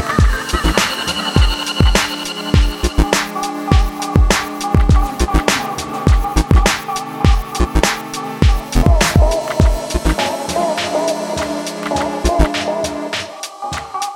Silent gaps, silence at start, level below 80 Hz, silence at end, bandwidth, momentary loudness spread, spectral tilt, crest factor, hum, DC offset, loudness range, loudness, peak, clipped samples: none; 0 s; -18 dBFS; 0 s; 17 kHz; 8 LU; -4.5 dB/octave; 14 dB; none; under 0.1%; 3 LU; -16 LUFS; 0 dBFS; under 0.1%